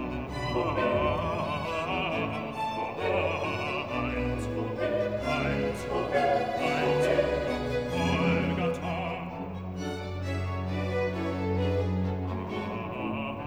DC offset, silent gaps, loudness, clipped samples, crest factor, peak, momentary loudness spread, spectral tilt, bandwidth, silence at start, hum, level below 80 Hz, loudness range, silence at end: 0.1%; none; -30 LUFS; under 0.1%; 16 dB; -12 dBFS; 8 LU; -6.5 dB/octave; over 20 kHz; 0 s; none; -46 dBFS; 4 LU; 0 s